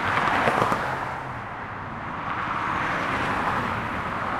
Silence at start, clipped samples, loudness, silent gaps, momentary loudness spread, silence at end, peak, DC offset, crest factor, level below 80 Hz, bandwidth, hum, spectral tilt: 0 s; under 0.1%; -26 LUFS; none; 12 LU; 0 s; -4 dBFS; under 0.1%; 22 dB; -48 dBFS; 16.5 kHz; none; -5 dB/octave